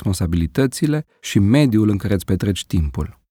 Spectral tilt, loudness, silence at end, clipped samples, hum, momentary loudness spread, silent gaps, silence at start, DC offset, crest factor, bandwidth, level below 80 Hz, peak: -6.5 dB/octave; -19 LUFS; 0.2 s; under 0.1%; none; 8 LU; none; 0 s; under 0.1%; 14 dB; 17.5 kHz; -32 dBFS; -4 dBFS